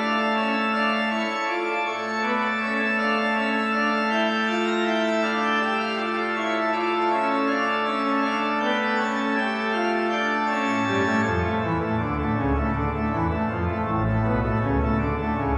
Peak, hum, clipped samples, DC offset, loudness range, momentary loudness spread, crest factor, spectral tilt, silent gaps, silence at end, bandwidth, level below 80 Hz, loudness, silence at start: -10 dBFS; none; under 0.1%; under 0.1%; 2 LU; 3 LU; 14 dB; -6 dB/octave; none; 0 s; 9.4 kHz; -38 dBFS; -23 LUFS; 0 s